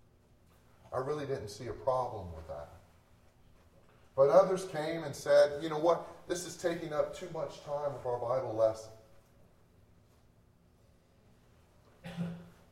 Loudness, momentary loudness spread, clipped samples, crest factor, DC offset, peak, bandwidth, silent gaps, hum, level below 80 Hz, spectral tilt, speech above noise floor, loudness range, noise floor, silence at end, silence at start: -33 LUFS; 19 LU; under 0.1%; 24 dB; under 0.1%; -12 dBFS; 14 kHz; none; none; -64 dBFS; -5.5 dB/octave; 33 dB; 10 LU; -65 dBFS; 0.2 s; 0.85 s